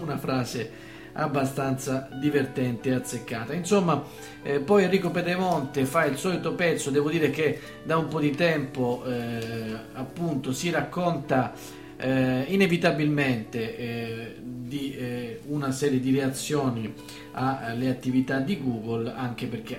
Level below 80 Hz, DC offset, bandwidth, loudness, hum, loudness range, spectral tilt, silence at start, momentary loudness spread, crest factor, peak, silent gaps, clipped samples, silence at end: -58 dBFS; under 0.1%; 16 kHz; -27 LUFS; none; 4 LU; -6 dB/octave; 0 s; 11 LU; 20 dB; -6 dBFS; none; under 0.1%; 0 s